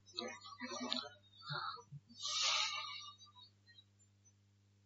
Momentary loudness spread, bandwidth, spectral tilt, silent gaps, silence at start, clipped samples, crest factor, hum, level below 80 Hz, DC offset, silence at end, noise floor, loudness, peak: 24 LU; 7.6 kHz; 0 dB/octave; none; 0.05 s; under 0.1%; 28 dB; 50 Hz at -70 dBFS; -88 dBFS; under 0.1%; 0.55 s; -72 dBFS; -40 LUFS; -18 dBFS